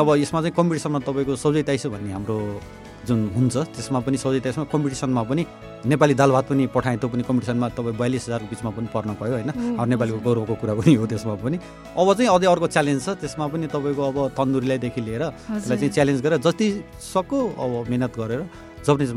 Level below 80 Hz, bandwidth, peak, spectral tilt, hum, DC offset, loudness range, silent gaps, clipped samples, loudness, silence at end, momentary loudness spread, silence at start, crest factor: -50 dBFS; 14.5 kHz; -2 dBFS; -6.5 dB/octave; none; under 0.1%; 4 LU; none; under 0.1%; -23 LUFS; 0 s; 10 LU; 0 s; 20 dB